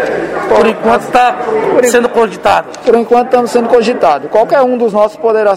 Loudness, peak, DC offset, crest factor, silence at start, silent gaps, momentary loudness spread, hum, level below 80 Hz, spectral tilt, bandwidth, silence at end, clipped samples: -10 LUFS; 0 dBFS; 0.3%; 10 dB; 0 s; none; 3 LU; none; -46 dBFS; -4.5 dB/octave; 16 kHz; 0 s; 0.5%